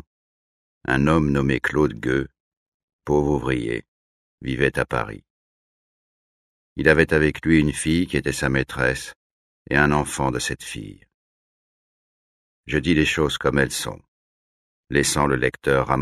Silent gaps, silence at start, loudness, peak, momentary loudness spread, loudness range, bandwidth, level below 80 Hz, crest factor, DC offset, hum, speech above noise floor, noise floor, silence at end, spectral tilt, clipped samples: 2.40-2.51 s, 2.57-2.99 s, 3.88-4.38 s, 5.30-6.76 s, 9.16-9.66 s, 11.14-12.64 s, 14.08-14.84 s; 0.9 s; -21 LUFS; -2 dBFS; 15 LU; 5 LU; 14 kHz; -40 dBFS; 22 dB; under 0.1%; none; over 69 dB; under -90 dBFS; 0 s; -5 dB/octave; under 0.1%